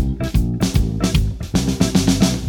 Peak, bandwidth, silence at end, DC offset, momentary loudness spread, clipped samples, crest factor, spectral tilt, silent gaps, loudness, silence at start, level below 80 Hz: -2 dBFS; 19.5 kHz; 0 s; under 0.1%; 5 LU; under 0.1%; 14 dB; -5.5 dB/octave; none; -19 LUFS; 0 s; -24 dBFS